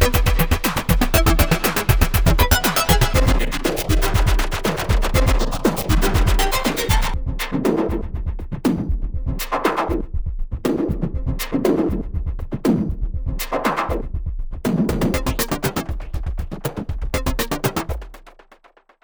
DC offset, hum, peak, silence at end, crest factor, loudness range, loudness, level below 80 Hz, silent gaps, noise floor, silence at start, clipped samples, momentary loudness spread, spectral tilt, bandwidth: 0.3%; none; -2 dBFS; 0.75 s; 16 dB; 6 LU; -21 LUFS; -22 dBFS; none; -53 dBFS; 0 s; under 0.1%; 12 LU; -5 dB/octave; over 20 kHz